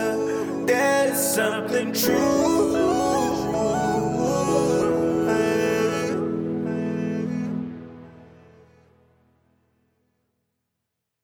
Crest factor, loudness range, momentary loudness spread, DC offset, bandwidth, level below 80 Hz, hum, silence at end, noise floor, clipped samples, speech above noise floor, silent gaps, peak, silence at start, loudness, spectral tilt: 16 dB; 11 LU; 7 LU; under 0.1%; over 20 kHz; -52 dBFS; none; 3 s; -81 dBFS; under 0.1%; 60 dB; none; -8 dBFS; 0 s; -22 LUFS; -4.5 dB/octave